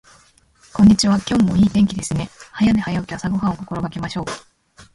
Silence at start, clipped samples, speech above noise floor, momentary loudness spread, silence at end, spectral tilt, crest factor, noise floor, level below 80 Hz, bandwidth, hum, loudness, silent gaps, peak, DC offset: 0.75 s; under 0.1%; 36 dB; 14 LU; 0.15 s; -5.5 dB/octave; 16 dB; -53 dBFS; -42 dBFS; 11.5 kHz; none; -18 LUFS; none; -2 dBFS; under 0.1%